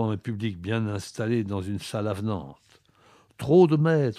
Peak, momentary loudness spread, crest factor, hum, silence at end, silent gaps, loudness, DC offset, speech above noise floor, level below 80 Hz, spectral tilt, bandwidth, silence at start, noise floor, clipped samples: -6 dBFS; 12 LU; 20 dB; none; 0 s; none; -26 LUFS; under 0.1%; 34 dB; -60 dBFS; -7.5 dB/octave; 13.5 kHz; 0 s; -59 dBFS; under 0.1%